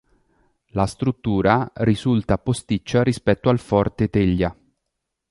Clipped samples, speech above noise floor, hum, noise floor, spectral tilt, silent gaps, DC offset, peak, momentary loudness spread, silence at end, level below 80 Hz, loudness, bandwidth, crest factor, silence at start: under 0.1%; 59 dB; none; -79 dBFS; -7 dB/octave; none; under 0.1%; -2 dBFS; 5 LU; 0.8 s; -40 dBFS; -21 LUFS; 11.5 kHz; 20 dB; 0.75 s